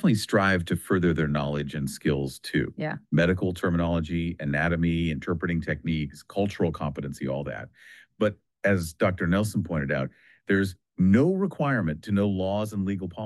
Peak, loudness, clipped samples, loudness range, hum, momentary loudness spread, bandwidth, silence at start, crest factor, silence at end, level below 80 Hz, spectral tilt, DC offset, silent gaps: -10 dBFS; -27 LUFS; under 0.1%; 4 LU; none; 9 LU; 12.5 kHz; 0 s; 16 dB; 0 s; -48 dBFS; -7 dB/octave; under 0.1%; none